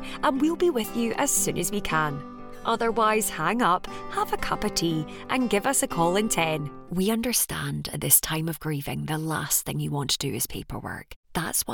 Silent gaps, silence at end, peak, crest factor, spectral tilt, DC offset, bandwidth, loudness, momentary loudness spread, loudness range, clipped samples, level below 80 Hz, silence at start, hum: 11.16-11.23 s; 0 s; -4 dBFS; 22 dB; -3.5 dB/octave; under 0.1%; 18 kHz; -25 LUFS; 9 LU; 2 LU; under 0.1%; -46 dBFS; 0 s; none